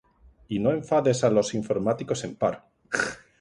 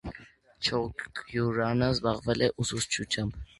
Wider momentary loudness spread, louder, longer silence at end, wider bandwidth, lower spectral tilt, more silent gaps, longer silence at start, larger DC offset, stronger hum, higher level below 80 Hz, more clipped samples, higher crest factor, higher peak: about the same, 9 LU vs 9 LU; first, -26 LUFS vs -29 LUFS; about the same, 0.25 s vs 0.15 s; about the same, 11.5 kHz vs 11.5 kHz; about the same, -5.5 dB/octave vs -4.5 dB/octave; neither; first, 0.5 s vs 0.05 s; neither; neither; second, -58 dBFS vs -50 dBFS; neither; about the same, 18 dB vs 20 dB; about the same, -8 dBFS vs -10 dBFS